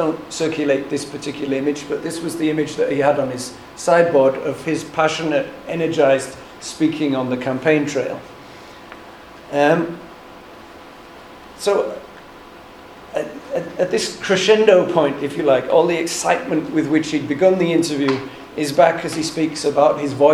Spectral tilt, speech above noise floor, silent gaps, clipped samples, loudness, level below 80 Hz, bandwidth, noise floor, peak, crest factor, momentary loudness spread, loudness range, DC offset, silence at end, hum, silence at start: -4.5 dB/octave; 22 dB; none; under 0.1%; -19 LUFS; -56 dBFS; 14.5 kHz; -40 dBFS; 0 dBFS; 18 dB; 24 LU; 8 LU; under 0.1%; 0 s; none; 0 s